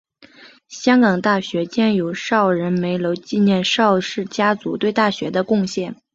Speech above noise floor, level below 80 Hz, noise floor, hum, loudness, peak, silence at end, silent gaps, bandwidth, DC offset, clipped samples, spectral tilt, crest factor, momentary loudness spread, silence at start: 28 dB; -60 dBFS; -46 dBFS; none; -18 LUFS; -2 dBFS; 0.2 s; none; 7.8 kHz; under 0.1%; under 0.1%; -5.5 dB/octave; 16 dB; 7 LU; 0.4 s